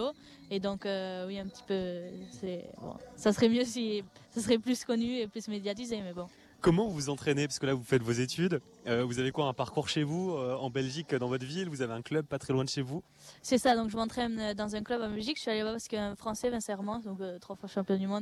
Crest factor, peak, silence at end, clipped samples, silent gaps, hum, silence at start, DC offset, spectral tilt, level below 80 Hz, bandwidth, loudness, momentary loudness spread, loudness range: 20 dB; -14 dBFS; 0 s; under 0.1%; none; none; 0 s; under 0.1%; -5 dB/octave; -62 dBFS; 13.5 kHz; -33 LUFS; 12 LU; 3 LU